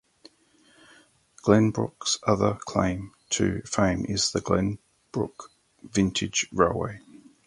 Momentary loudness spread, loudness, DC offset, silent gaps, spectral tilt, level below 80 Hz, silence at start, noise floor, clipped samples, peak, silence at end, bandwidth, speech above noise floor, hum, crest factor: 12 LU; -26 LUFS; under 0.1%; none; -4.5 dB/octave; -48 dBFS; 1.45 s; -61 dBFS; under 0.1%; -4 dBFS; 0.3 s; 11.5 kHz; 36 dB; none; 22 dB